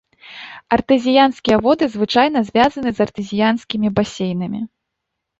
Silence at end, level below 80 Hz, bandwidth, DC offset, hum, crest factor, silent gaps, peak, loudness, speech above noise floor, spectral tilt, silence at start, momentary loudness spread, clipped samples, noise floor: 0.75 s; -48 dBFS; 8 kHz; under 0.1%; none; 16 dB; none; -2 dBFS; -17 LUFS; 62 dB; -6 dB/octave; 0.25 s; 13 LU; under 0.1%; -78 dBFS